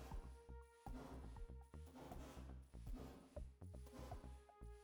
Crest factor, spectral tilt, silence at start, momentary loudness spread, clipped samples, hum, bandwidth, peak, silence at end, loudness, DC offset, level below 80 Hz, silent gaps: 14 dB; -6.5 dB/octave; 0 s; 5 LU; under 0.1%; none; over 20 kHz; -42 dBFS; 0 s; -58 LUFS; under 0.1%; -58 dBFS; none